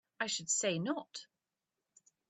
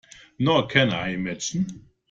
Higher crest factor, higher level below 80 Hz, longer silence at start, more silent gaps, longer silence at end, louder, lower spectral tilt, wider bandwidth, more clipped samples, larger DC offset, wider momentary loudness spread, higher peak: about the same, 22 dB vs 22 dB; second, -84 dBFS vs -56 dBFS; second, 0.2 s vs 0.4 s; neither; first, 1.05 s vs 0.3 s; second, -35 LUFS vs -23 LUFS; second, -2.5 dB/octave vs -4.5 dB/octave; about the same, 8.8 kHz vs 9.2 kHz; neither; neither; first, 16 LU vs 9 LU; second, -18 dBFS vs -4 dBFS